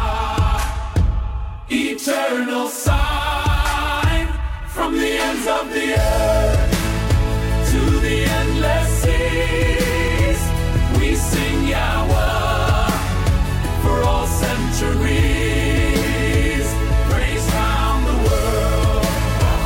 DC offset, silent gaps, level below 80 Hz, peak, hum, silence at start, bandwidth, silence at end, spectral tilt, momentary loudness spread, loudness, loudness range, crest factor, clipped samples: under 0.1%; none; -20 dBFS; -4 dBFS; none; 0 s; 16.5 kHz; 0 s; -5 dB/octave; 3 LU; -19 LUFS; 2 LU; 14 dB; under 0.1%